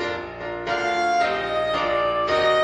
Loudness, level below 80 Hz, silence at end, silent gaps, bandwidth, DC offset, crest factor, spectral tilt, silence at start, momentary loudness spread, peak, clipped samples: -23 LUFS; -50 dBFS; 0 s; none; 10 kHz; under 0.1%; 12 dB; -4 dB/octave; 0 s; 9 LU; -10 dBFS; under 0.1%